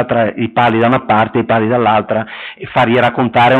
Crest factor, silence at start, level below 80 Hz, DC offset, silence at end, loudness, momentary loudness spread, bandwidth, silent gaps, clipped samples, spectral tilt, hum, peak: 10 dB; 0 s; -48 dBFS; under 0.1%; 0 s; -13 LUFS; 8 LU; 8.4 kHz; none; under 0.1%; -8 dB/octave; none; -2 dBFS